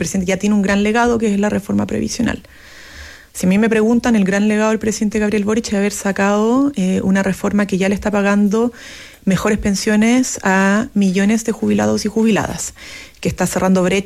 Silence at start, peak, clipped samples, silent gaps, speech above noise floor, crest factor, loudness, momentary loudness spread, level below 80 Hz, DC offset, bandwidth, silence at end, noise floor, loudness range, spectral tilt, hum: 0 s; -4 dBFS; under 0.1%; none; 21 dB; 10 dB; -16 LUFS; 10 LU; -40 dBFS; under 0.1%; 14.5 kHz; 0 s; -37 dBFS; 2 LU; -5.5 dB/octave; none